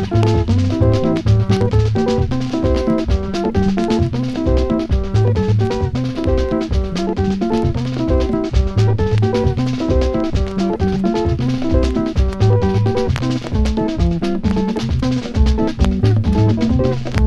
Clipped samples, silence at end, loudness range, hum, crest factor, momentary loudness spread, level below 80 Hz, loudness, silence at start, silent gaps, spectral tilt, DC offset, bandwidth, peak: under 0.1%; 0 s; 1 LU; none; 14 dB; 4 LU; -22 dBFS; -17 LUFS; 0 s; none; -8 dB/octave; under 0.1%; 9 kHz; 0 dBFS